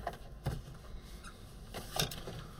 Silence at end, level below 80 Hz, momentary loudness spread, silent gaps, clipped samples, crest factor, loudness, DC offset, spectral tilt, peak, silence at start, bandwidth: 0 s; -50 dBFS; 15 LU; none; under 0.1%; 26 dB; -42 LUFS; under 0.1%; -3.5 dB/octave; -18 dBFS; 0 s; 17 kHz